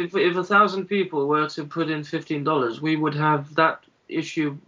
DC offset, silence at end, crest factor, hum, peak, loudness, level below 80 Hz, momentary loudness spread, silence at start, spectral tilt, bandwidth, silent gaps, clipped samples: under 0.1%; 0.1 s; 18 dB; none; -4 dBFS; -23 LUFS; -74 dBFS; 10 LU; 0 s; -6.5 dB/octave; 7.6 kHz; none; under 0.1%